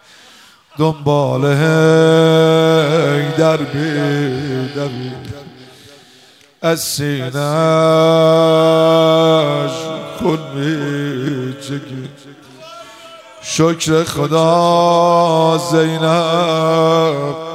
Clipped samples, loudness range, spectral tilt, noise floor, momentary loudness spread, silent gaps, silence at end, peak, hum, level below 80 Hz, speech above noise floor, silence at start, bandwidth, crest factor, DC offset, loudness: under 0.1%; 9 LU; -5.5 dB/octave; -46 dBFS; 14 LU; none; 0 s; 0 dBFS; none; -56 dBFS; 33 dB; 0.75 s; 16 kHz; 14 dB; under 0.1%; -14 LUFS